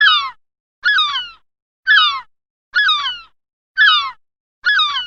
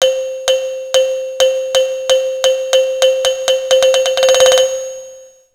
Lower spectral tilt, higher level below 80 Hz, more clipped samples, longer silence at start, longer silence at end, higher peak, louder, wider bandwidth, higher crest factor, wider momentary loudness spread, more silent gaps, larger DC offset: about the same, 2.5 dB/octave vs 1.5 dB/octave; about the same, -60 dBFS vs -56 dBFS; neither; about the same, 0 s vs 0 s; second, 0 s vs 0.3 s; about the same, 0 dBFS vs 0 dBFS; about the same, -14 LUFS vs -13 LUFS; second, 7.8 kHz vs 16 kHz; about the same, 16 dB vs 14 dB; first, 16 LU vs 8 LU; first, 0.60-0.82 s, 1.62-1.83 s, 2.50-2.72 s, 3.53-3.75 s, 4.40-4.62 s vs none; neither